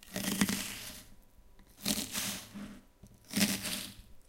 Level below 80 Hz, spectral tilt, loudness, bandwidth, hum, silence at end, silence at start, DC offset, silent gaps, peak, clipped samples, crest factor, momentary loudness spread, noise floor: -58 dBFS; -2.5 dB/octave; -34 LUFS; 17 kHz; none; 0.1 s; 0 s; under 0.1%; none; -12 dBFS; under 0.1%; 26 dB; 17 LU; -58 dBFS